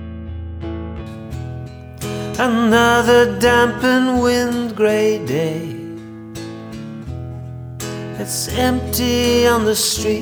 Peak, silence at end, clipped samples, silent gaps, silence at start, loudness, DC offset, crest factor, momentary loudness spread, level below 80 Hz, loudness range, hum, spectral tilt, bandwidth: -2 dBFS; 0 s; under 0.1%; none; 0 s; -16 LUFS; under 0.1%; 16 dB; 18 LU; -38 dBFS; 10 LU; none; -4 dB/octave; over 20 kHz